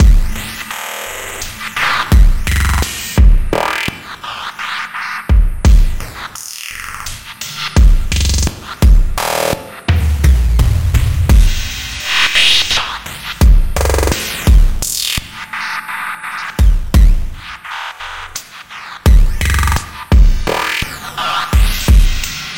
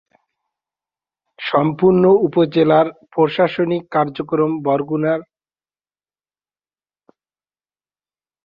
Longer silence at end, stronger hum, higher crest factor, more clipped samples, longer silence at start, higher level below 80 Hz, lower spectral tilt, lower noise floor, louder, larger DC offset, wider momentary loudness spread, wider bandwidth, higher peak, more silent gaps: second, 0 s vs 3.2 s; second, none vs 50 Hz at -50 dBFS; second, 12 dB vs 18 dB; neither; second, 0 s vs 1.4 s; first, -14 dBFS vs -60 dBFS; second, -4 dB/octave vs -9.5 dB/octave; second, -31 dBFS vs under -90 dBFS; about the same, -15 LUFS vs -17 LUFS; neither; first, 12 LU vs 7 LU; first, 17 kHz vs 5.6 kHz; about the same, 0 dBFS vs 0 dBFS; neither